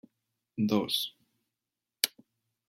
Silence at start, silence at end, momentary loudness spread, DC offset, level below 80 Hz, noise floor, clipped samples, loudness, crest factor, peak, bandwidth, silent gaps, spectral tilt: 0.55 s; 0.6 s; 9 LU; under 0.1%; -78 dBFS; -89 dBFS; under 0.1%; -31 LUFS; 30 dB; -4 dBFS; 16.5 kHz; none; -3.5 dB/octave